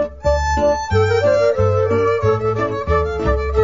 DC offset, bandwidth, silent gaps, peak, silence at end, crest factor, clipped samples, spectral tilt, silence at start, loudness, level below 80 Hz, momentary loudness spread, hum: 0.5%; 7.6 kHz; none; -4 dBFS; 0 s; 12 dB; under 0.1%; -6.5 dB/octave; 0 s; -17 LUFS; -26 dBFS; 4 LU; none